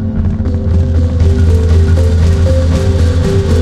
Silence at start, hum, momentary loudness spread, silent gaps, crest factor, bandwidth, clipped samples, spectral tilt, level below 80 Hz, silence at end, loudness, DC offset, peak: 0 s; none; 5 LU; none; 10 dB; 9 kHz; under 0.1%; -8 dB/octave; -14 dBFS; 0 s; -11 LUFS; under 0.1%; 0 dBFS